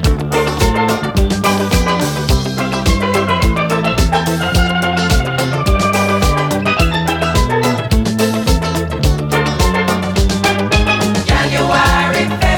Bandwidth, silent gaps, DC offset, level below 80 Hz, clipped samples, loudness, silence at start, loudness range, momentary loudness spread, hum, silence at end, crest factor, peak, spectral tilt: 19.5 kHz; none; under 0.1%; -20 dBFS; under 0.1%; -14 LUFS; 0 s; 1 LU; 3 LU; none; 0 s; 14 dB; 0 dBFS; -5 dB/octave